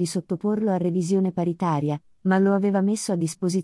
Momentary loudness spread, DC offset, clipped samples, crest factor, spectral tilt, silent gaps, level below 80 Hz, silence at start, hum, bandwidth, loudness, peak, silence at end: 6 LU; under 0.1%; under 0.1%; 14 dB; -6.5 dB/octave; none; -68 dBFS; 0 s; none; 12 kHz; -24 LUFS; -8 dBFS; 0 s